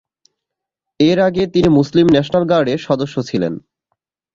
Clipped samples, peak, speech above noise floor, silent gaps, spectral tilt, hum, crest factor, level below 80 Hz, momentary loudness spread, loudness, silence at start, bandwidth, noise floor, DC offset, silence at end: under 0.1%; -2 dBFS; 68 dB; none; -7 dB/octave; none; 14 dB; -46 dBFS; 8 LU; -15 LUFS; 1 s; 7.6 kHz; -82 dBFS; under 0.1%; 0.75 s